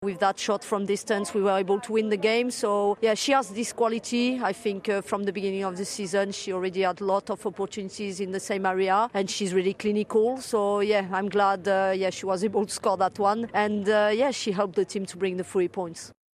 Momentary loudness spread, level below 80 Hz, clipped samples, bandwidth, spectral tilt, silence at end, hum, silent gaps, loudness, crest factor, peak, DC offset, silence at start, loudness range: 7 LU; -68 dBFS; under 0.1%; 13.5 kHz; -4 dB/octave; 0.2 s; none; none; -26 LUFS; 16 dB; -10 dBFS; under 0.1%; 0 s; 3 LU